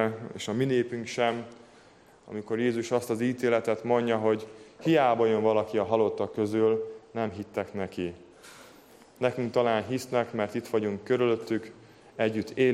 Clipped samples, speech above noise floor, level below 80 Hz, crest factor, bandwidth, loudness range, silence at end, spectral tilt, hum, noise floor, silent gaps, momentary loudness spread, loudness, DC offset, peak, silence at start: under 0.1%; 29 dB; -70 dBFS; 18 dB; 15 kHz; 5 LU; 0 s; -6 dB/octave; none; -56 dBFS; none; 12 LU; -28 LUFS; under 0.1%; -10 dBFS; 0 s